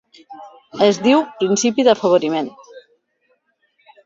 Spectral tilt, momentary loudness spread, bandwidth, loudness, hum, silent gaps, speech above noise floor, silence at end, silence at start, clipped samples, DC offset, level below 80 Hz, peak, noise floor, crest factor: -4 dB/octave; 16 LU; 7.8 kHz; -16 LUFS; none; none; 48 dB; 1.25 s; 0.3 s; under 0.1%; under 0.1%; -64 dBFS; -2 dBFS; -65 dBFS; 18 dB